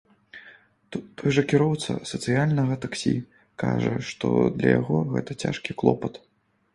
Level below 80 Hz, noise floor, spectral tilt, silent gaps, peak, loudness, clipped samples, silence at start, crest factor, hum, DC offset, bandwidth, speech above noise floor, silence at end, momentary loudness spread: -56 dBFS; -53 dBFS; -6.5 dB/octave; none; -2 dBFS; -25 LUFS; under 0.1%; 0.35 s; 22 dB; none; under 0.1%; 11.5 kHz; 29 dB; 0.55 s; 15 LU